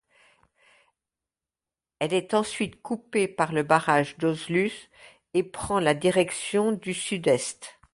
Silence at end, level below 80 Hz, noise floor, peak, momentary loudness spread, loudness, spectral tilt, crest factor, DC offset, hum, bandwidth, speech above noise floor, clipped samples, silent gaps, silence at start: 0.25 s; -60 dBFS; under -90 dBFS; -4 dBFS; 9 LU; -26 LUFS; -4.5 dB/octave; 22 dB; under 0.1%; none; 11.5 kHz; over 64 dB; under 0.1%; none; 2 s